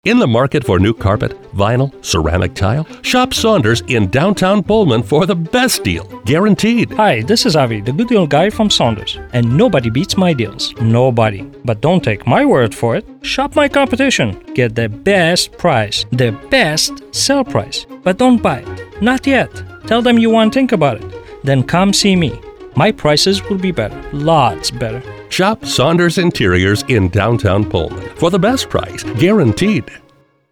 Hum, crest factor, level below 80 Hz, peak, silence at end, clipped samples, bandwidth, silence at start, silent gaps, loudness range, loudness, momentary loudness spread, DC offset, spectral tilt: none; 12 dB; -36 dBFS; -2 dBFS; 0.55 s; under 0.1%; 18.5 kHz; 0.05 s; none; 2 LU; -13 LUFS; 8 LU; under 0.1%; -5 dB/octave